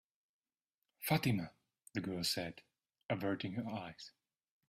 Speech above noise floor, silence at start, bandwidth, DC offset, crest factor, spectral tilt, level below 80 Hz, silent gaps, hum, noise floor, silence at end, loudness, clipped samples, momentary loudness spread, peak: over 51 dB; 1 s; 16 kHz; under 0.1%; 22 dB; -5 dB/octave; -72 dBFS; 3.04-3.09 s; none; under -90 dBFS; 0.6 s; -39 LUFS; under 0.1%; 19 LU; -20 dBFS